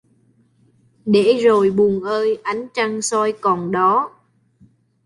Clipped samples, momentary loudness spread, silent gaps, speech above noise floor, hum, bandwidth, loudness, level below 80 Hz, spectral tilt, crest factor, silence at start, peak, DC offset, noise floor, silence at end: under 0.1%; 9 LU; none; 41 dB; none; 11.5 kHz; -17 LUFS; -60 dBFS; -5 dB/octave; 16 dB; 1.05 s; -4 dBFS; under 0.1%; -58 dBFS; 0.95 s